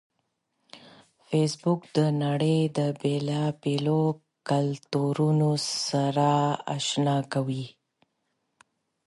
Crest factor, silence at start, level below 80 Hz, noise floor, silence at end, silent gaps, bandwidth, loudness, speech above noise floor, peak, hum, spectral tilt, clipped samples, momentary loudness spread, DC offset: 16 dB; 0.75 s; -70 dBFS; -77 dBFS; 1.35 s; none; 11.5 kHz; -26 LUFS; 52 dB; -10 dBFS; none; -6 dB/octave; under 0.1%; 6 LU; under 0.1%